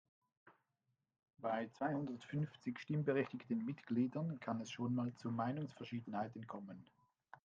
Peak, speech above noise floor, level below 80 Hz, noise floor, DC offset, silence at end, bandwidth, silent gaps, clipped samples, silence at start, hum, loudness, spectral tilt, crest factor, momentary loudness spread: -24 dBFS; 45 dB; -84 dBFS; -87 dBFS; under 0.1%; 0.1 s; 7.6 kHz; none; under 0.1%; 0.45 s; none; -43 LUFS; -7.5 dB/octave; 20 dB; 9 LU